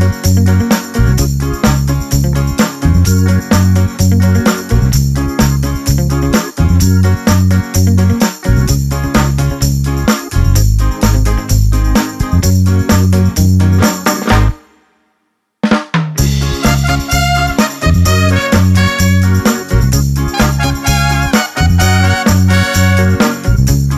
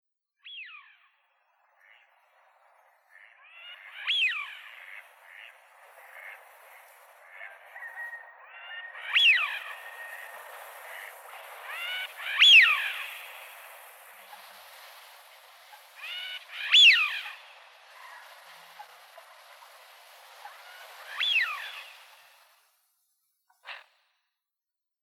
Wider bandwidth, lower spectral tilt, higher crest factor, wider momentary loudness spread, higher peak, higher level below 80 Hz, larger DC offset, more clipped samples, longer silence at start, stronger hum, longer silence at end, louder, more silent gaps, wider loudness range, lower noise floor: second, 14 kHz vs 18 kHz; first, -5.5 dB/octave vs 6.5 dB/octave; second, 10 dB vs 22 dB; second, 4 LU vs 30 LU; first, 0 dBFS vs -8 dBFS; first, -18 dBFS vs under -90 dBFS; neither; neither; second, 0 s vs 0.45 s; neither; second, 0 s vs 1.25 s; first, -12 LUFS vs -21 LUFS; neither; second, 2 LU vs 22 LU; second, -64 dBFS vs -89 dBFS